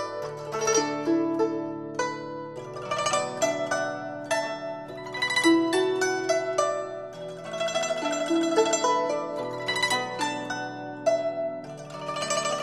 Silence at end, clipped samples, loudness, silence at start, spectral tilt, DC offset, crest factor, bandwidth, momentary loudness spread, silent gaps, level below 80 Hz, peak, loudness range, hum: 0 s; under 0.1%; -27 LUFS; 0 s; -3 dB/octave; under 0.1%; 18 dB; 13 kHz; 13 LU; none; -66 dBFS; -8 dBFS; 3 LU; none